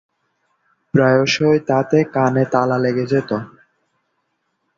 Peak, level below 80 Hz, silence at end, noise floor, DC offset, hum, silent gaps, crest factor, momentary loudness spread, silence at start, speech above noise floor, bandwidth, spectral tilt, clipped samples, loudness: -2 dBFS; -56 dBFS; 1.3 s; -70 dBFS; under 0.1%; none; none; 18 dB; 7 LU; 0.95 s; 54 dB; 7.6 kHz; -6.5 dB/octave; under 0.1%; -17 LUFS